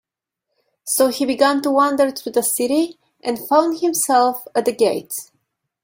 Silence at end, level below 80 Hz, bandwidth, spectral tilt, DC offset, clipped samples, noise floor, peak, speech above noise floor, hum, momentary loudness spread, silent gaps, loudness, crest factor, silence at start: 0.6 s; -66 dBFS; 17 kHz; -2.5 dB/octave; under 0.1%; under 0.1%; -80 dBFS; -2 dBFS; 62 dB; none; 10 LU; none; -18 LUFS; 18 dB; 0.85 s